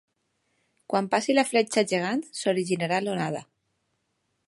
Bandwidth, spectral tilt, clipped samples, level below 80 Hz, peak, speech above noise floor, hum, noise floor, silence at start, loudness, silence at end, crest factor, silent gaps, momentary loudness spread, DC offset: 11.5 kHz; -4.5 dB/octave; under 0.1%; -76 dBFS; -6 dBFS; 51 dB; none; -76 dBFS; 0.9 s; -26 LUFS; 1.05 s; 20 dB; none; 7 LU; under 0.1%